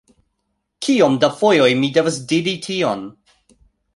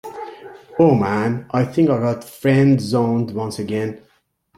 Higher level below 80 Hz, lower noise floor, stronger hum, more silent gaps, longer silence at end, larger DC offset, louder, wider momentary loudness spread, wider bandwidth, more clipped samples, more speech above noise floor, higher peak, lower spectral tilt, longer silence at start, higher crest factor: about the same, -60 dBFS vs -56 dBFS; first, -73 dBFS vs -61 dBFS; neither; neither; first, 0.85 s vs 0.6 s; neither; about the same, -17 LUFS vs -18 LUFS; second, 10 LU vs 14 LU; second, 11.5 kHz vs 15 kHz; neither; first, 56 dB vs 43 dB; about the same, 0 dBFS vs -2 dBFS; second, -4.5 dB/octave vs -7.5 dB/octave; first, 0.8 s vs 0.05 s; about the same, 18 dB vs 16 dB